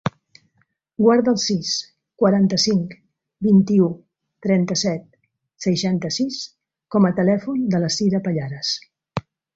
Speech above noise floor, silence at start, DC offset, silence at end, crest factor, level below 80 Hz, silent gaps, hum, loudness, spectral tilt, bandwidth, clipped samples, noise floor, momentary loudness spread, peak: 48 dB; 0.05 s; under 0.1%; 0.35 s; 18 dB; -60 dBFS; none; none; -20 LUFS; -5.5 dB/octave; 7.8 kHz; under 0.1%; -66 dBFS; 15 LU; -4 dBFS